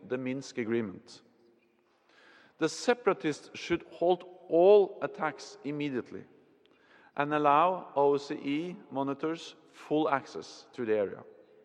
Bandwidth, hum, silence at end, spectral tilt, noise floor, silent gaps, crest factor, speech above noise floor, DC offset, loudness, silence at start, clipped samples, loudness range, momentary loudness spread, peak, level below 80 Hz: 10 kHz; none; 0.4 s; -5.5 dB/octave; -69 dBFS; none; 20 dB; 39 dB; under 0.1%; -30 LUFS; 0.05 s; under 0.1%; 6 LU; 17 LU; -10 dBFS; -74 dBFS